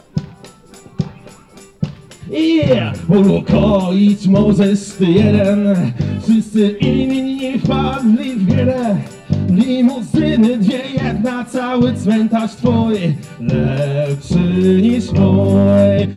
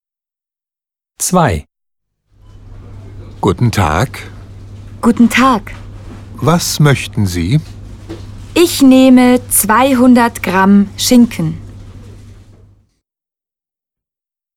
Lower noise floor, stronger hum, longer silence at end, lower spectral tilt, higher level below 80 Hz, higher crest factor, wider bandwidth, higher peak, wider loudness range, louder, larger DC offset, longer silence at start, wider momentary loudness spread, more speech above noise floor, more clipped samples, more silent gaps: second, -41 dBFS vs -89 dBFS; neither; second, 0 s vs 2.4 s; first, -8 dB/octave vs -5 dB/octave; about the same, -38 dBFS vs -36 dBFS; about the same, 10 dB vs 14 dB; second, 11.5 kHz vs 17 kHz; second, -4 dBFS vs 0 dBFS; second, 4 LU vs 10 LU; second, -14 LUFS vs -11 LUFS; neither; second, 0.15 s vs 1.2 s; second, 9 LU vs 23 LU; second, 28 dB vs 79 dB; neither; neither